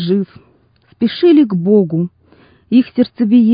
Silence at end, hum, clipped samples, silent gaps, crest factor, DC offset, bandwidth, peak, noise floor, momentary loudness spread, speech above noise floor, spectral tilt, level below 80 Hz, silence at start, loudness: 0 s; none; under 0.1%; none; 12 dB; under 0.1%; 5.2 kHz; -2 dBFS; -52 dBFS; 9 LU; 40 dB; -13 dB/octave; -56 dBFS; 0 s; -14 LUFS